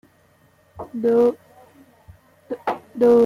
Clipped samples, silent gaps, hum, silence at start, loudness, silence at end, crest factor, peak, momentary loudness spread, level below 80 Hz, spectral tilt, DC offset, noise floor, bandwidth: under 0.1%; none; none; 0.75 s; -21 LUFS; 0 s; 16 dB; -6 dBFS; 20 LU; -60 dBFS; -7.5 dB/octave; under 0.1%; -57 dBFS; 9.8 kHz